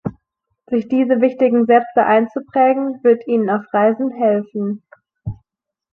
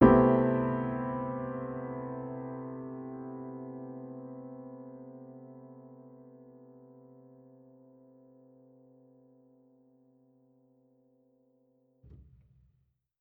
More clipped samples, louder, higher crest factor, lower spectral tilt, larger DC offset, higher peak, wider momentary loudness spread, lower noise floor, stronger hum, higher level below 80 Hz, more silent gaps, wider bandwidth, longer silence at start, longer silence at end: neither; first, -16 LUFS vs -33 LUFS; second, 16 dB vs 28 dB; about the same, -9.5 dB/octave vs -9 dB/octave; neither; first, -2 dBFS vs -8 dBFS; second, 16 LU vs 27 LU; about the same, -75 dBFS vs -75 dBFS; neither; about the same, -52 dBFS vs -56 dBFS; neither; first, 4.2 kHz vs 3.4 kHz; about the same, 0.05 s vs 0 s; second, 0.6 s vs 1.05 s